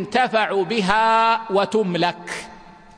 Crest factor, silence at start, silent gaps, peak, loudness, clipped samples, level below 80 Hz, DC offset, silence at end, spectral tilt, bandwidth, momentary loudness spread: 16 dB; 0 s; none; -4 dBFS; -19 LUFS; under 0.1%; -52 dBFS; under 0.1%; 0.25 s; -5 dB/octave; 10.5 kHz; 15 LU